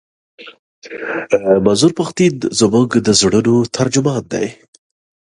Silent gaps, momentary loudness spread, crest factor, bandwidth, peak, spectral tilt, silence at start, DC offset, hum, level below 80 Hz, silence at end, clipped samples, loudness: 0.59-0.82 s; 11 LU; 16 dB; 11.5 kHz; 0 dBFS; -4.5 dB/octave; 0.4 s; under 0.1%; none; -48 dBFS; 0.85 s; under 0.1%; -14 LUFS